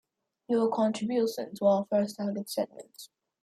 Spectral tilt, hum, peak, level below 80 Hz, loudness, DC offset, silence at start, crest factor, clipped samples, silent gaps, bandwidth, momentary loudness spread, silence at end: -6 dB/octave; none; -12 dBFS; -76 dBFS; -29 LUFS; under 0.1%; 0.5 s; 18 dB; under 0.1%; none; 15.5 kHz; 14 LU; 0.35 s